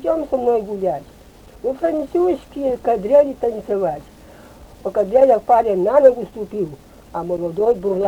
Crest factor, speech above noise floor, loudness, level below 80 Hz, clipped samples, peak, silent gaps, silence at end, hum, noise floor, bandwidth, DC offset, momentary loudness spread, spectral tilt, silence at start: 18 dB; 26 dB; -18 LUFS; -48 dBFS; under 0.1%; 0 dBFS; none; 0 s; none; -44 dBFS; 15 kHz; under 0.1%; 14 LU; -8 dB/octave; 0 s